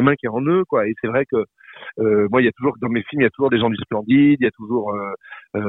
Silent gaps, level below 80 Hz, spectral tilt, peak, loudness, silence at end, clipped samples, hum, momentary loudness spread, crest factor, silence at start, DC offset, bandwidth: none; -58 dBFS; -10.5 dB/octave; -2 dBFS; -19 LUFS; 0 s; under 0.1%; none; 13 LU; 16 dB; 0 s; under 0.1%; 4 kHz